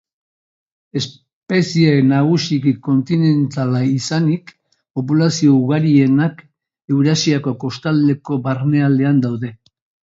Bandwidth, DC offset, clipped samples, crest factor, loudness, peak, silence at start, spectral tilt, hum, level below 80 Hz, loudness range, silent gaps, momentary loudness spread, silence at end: 7.8 kHz; under 0.1%; under 0.1%; 14 dB; -16 LUFS; -2 dBFS; 0.95 s; -6.5 dB/octave; none; -60 dBFS; 2 LU; 1.33-1.42 s; 11 LU; 0.55 s